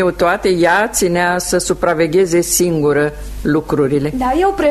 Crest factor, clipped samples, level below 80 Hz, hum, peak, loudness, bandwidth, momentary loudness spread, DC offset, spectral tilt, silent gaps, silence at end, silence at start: 14 dB; under 0.1%; -34 dBFS; none; 0 dBFS; -14 LUFS; 13.5 kHz; 4 LU; under 0.1%; -4.5 dB/octave; none; 0 s; 0 s